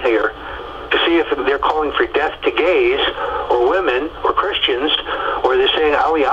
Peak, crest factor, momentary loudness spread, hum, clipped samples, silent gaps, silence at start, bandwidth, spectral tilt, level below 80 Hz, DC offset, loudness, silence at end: -2 dBFS; 16 dB; 5 LU; none; under 0.1%; none; 0 s; 7.6 kHz; -5 dB/octave; -40 dBFS; under 0.1%; -16 LUFS; 0 s